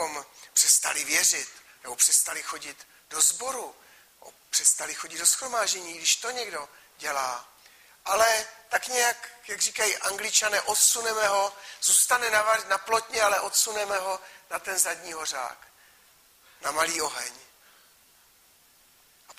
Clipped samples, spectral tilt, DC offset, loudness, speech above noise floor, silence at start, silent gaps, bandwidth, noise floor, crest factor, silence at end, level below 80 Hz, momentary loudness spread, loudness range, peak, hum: under 0.1%; 2 dB/octave; under 0.1%; -24 LUFS; 33 dB; 0 s; none; 15.5 kHz; -60 dBFS; 22 dB; 0.05 s; -70 dBFS; 16 LU; 8 LU; -6 dBFS; none